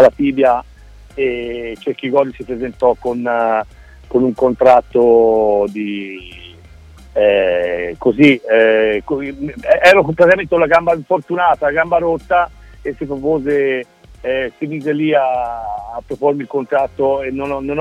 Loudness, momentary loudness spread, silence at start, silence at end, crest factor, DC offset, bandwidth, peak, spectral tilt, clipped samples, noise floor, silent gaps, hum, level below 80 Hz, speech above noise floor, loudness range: -15 LUFS; 14 LU; 0 s; 0 s; 14 dB; under 0.1%; 11 kHz; 0 dBFS; -6.5 dB/octave; under 0.1%; -40 dBFS; none; none; -42 dBFS; 25 dB; 6 LU